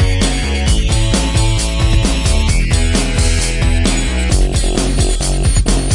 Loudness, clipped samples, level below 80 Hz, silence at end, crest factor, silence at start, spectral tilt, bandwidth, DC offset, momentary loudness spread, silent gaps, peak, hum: -15 LUFS; under 0.1%; -14 dBFS; 0 s; 12 dB; 0 s; -4.5 dB/octave; 11.5 kHz; under 0.1%; 1 LU; none; 0 dBFS; none